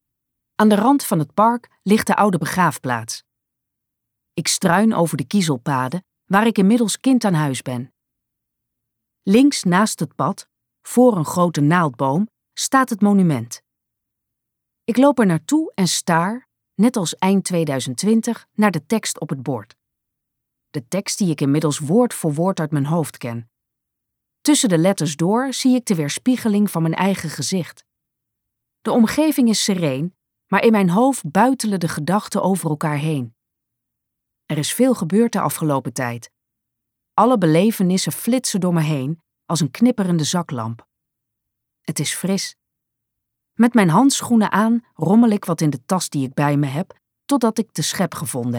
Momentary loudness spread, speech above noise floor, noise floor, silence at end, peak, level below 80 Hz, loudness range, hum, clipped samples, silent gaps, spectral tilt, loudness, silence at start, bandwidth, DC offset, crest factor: 12 LU; 62 dB; -80 dBFS; 0 s; -2 dBFS; -64 dBFS; 4 LU; none; under 0.1%; none; -5 dB/octave; -18 LUFS; 0.6 s; 18 kHz; under 0.1%; 16 dB